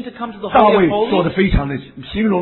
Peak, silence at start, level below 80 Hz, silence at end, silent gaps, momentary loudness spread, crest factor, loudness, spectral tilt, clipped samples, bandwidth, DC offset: 0 dBFS; 0 s; -28 dBFS; 0 s; none; 15 LU; 16 dB; -15 LUFS; -10.5 dB/octave; under 0.1%; 4.2 kHz; under 0.1%